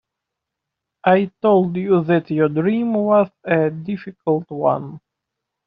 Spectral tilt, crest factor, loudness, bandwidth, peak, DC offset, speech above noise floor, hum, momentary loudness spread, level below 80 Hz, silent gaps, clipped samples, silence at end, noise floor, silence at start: -7 dB/octave; 16 dB; -19 LUFS; 5.2 kHz; -2 dBFS; under 0.1%; 64 dB; none; 9 LU; -62 dBFS; none; under 0.1%; 0.7 s; -82 dBFS; 1.05 s